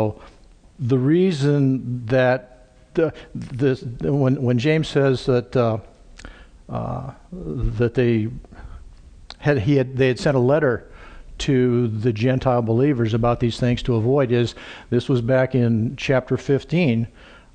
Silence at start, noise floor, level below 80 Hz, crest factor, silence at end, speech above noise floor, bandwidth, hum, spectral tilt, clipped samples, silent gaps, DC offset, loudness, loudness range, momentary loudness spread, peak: 0 s; -43 dBFS; -40 dBFS; 16 dB; 0.3 s; 23 dB; 9.4 kHz; none; -7.5 dB/octave; under 0.1%; none; under 0.1%; -20 LUFS; 4 LU; 11 LU; -4 dBFS